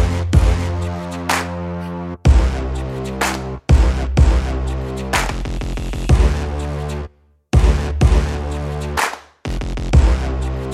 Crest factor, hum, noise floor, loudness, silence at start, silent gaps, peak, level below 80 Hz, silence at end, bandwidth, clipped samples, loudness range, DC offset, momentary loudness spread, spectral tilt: 16 dB; none; -38 dBFS; -19 LUFS; 0 s; none; 0 dBFS; -18 dBFS; 0 s; 14 kHz; under 0.1%; 2 LU; under 0.1%; 10 LU; -6 dB/octave